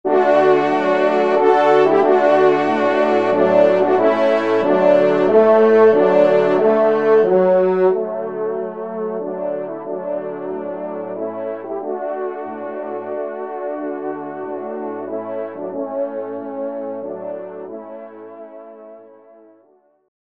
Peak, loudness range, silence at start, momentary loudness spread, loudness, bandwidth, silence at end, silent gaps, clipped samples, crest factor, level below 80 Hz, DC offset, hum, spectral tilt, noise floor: 0 dBFS; 14 LU; 0.05 s; 15 LU; -17 LUFS; 7.6 kHz; 1.35 s; none; under 0.1%; 16 dB; -70 dBFS; 0.2%; none; -7 dB/octave; -56 dBFS